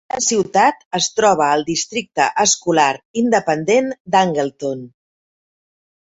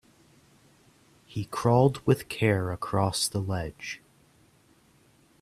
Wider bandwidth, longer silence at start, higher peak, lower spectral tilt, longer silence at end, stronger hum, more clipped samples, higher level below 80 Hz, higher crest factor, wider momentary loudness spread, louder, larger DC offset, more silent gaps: second, 8.2 kHz vs 14.5 kHz; second, 0.15 s vs 1.3 s; first, -2 dBFS vs -8 dBFS; second, -3 dB/octave vs -5.5 dB/octave; second, 1.15 s vs 1.45 s; neither; neither; about the same, -60 dBFS vs -56 dBFS; second, 16 dB vs 22 dB; second, 7 LU vs 16 LU; first, -17 LUFS vs -27 LUFS; neither; first, 0.85-0.91 s, 3.05-3.14 s, 4.00-4.05 s vs none